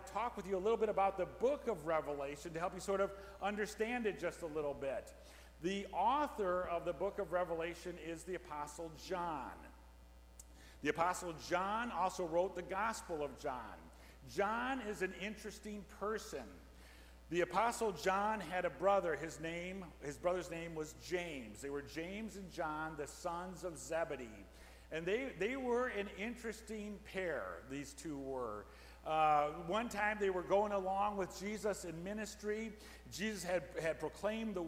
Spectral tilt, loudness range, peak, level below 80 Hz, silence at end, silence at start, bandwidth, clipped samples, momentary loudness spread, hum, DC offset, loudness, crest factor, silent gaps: -4.5 dB/octave; 6 LU; -20 dBFS; -60 dBFS; 0 s; 0 s; 16.5 kHz; under 0.1%; 13 LU; none; under 0.1%; -40 LUFS; 20 dB; none